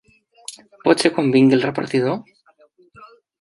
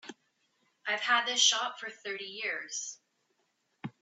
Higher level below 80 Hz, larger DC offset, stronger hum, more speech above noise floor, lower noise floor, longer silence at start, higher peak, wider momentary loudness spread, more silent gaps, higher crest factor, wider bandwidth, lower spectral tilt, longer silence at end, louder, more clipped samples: first, -66 dBFS vs under -90 dBFS; neither; neither; second, 38 dB vs 45 dB; second, -55 dBFS vs -77 dBFS; first, 0.5 s vs 0.05 s; first, -2 dBFS vs -10 dBFS; about the same, 22 LU vs 20 LU; neither; about the same, 20 dB vs 24 dB; first, 11.5 kHz vs 8.2 kHz; first, -5.5 dB/octave vs 0.5 dB/octave; first, 0.35 s vs 0.1 s; first, -18 LUFS vs -29 LUFS; neither